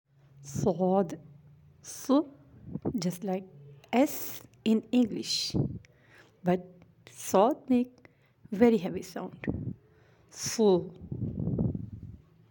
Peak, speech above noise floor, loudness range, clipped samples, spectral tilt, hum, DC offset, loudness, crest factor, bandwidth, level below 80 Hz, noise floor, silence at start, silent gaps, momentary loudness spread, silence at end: -8 dBFS; 32 dB; 3 LU; under 0.1%; -5.5 dB/octave; none; under 0.1%; -30 LUFS; 22 dB; 17 kHz; -56 dBFS; -61 dBFS; 0.4 s; none; 18 LU; 0.35 s